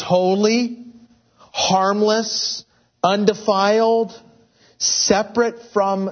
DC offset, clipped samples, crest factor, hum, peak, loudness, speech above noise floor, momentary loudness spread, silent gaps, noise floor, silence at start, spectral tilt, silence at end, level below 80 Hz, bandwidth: under 0.1%; under 0.1%; 18 dB; none; 0 dBFS; -18 LUFS; 36 dB; 9 LU; none; -54 dBFS; 0 s; -3.5 dB/octave; 0 s; -60 dBFS; 6.6 kHz